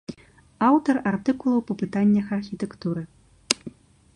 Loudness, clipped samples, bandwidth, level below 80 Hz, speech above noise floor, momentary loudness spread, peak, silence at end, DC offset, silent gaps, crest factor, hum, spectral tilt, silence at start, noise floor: -24 LUFS; under 0.1%; 11.5 kHz; -58 dBFS; 25 dB; 13 LU; 0 dBFS; 0.45 s; under 0.1%; none; 24 dB; none; -5 dB/octave; 0.1 s; -48 dBFS